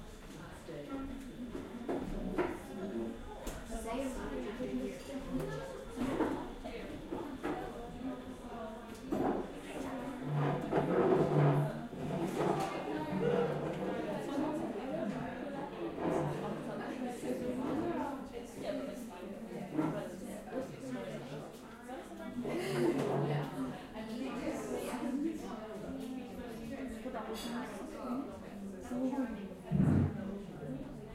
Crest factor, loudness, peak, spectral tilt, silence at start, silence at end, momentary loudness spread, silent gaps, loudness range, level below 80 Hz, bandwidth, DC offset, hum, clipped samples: 20 dB; -38 LUFS; -18 dBFS; -7 dB/octave; 0 s; 0 s; 12 LU; none; 8 LU; -56 dBFS; 16 kHz; under 0.1%; none; under 0.1%